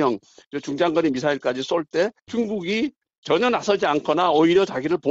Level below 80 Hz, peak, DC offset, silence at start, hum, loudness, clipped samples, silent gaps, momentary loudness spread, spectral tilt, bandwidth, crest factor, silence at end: -60 dBFS; -6 dBFS; under 0.1%; 0 s; none; -22 LUFS; under 0.1%; 0.46-0.51 s, 3.18-3.22 s; 12 LU; -5 dB/octave; 8 kHz; 14 dB; 0 s